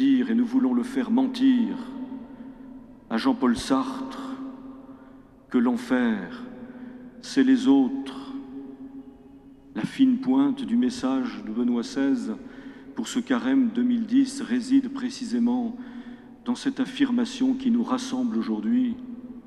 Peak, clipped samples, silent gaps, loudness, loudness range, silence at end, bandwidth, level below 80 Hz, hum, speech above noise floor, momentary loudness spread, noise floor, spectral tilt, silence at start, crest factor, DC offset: -8 dBFS; under 0.1%; none; -25 LUFS; 4 LU; 0.05 s; 11.5 kHz; -60 dBFS; none; 25 dB; 19 LU; -49 dBFS; -5 dB/octave; 0 s; 16 dB; under 0.1%